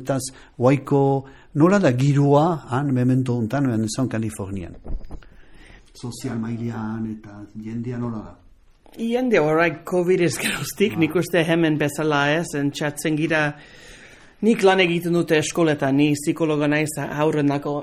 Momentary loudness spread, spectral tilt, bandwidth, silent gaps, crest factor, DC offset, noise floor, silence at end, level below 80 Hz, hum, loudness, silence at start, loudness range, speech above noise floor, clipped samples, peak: 14 LU; -6 dB/octave; 15 kHz; none; 18 dB; under 0.1%; -50 dBFS; 0 s; -46 dBFS; none; -21 LUFS; 0 s; 11 LU; 30 dB; under 0.1%; -4 dBFS